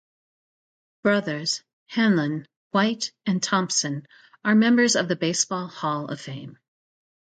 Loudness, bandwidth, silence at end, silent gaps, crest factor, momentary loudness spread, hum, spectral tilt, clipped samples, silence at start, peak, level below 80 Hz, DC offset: -23 LUFS; 9.2 kHz; 0.9 s; 1.73-1.86 s, 2.56-2.71 s; 18 dB; 13 LU; none; -4 dB/octave; under 0.1%; 1.05 s; -6 dBFS; -70 dBFS; under 0.1%